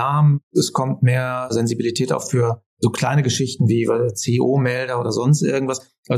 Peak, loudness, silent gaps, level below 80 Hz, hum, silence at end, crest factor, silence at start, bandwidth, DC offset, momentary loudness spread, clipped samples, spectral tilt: -6 dBFS; -19 LUFS; 0.43-0.51 s, 2.66-2.77 s, 5.98-6.03 s; -64 dBFS; none; 0 s; 14 dB; 0 s; 13.5 kHz; under 0.1%; 5 LU; under 0.1%; -6 dB/octave